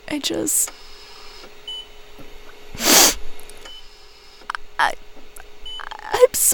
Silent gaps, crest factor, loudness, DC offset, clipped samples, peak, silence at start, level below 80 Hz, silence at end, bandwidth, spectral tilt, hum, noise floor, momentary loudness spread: none; 22 dB; -17 LUFS; under 0.1%; under 0.1%; 0 dBFS; 0.05 s; -42 dBFS; 0 s; over 20 kHz; -0.5 dB/octave; none; -43 dBFS; 28 LU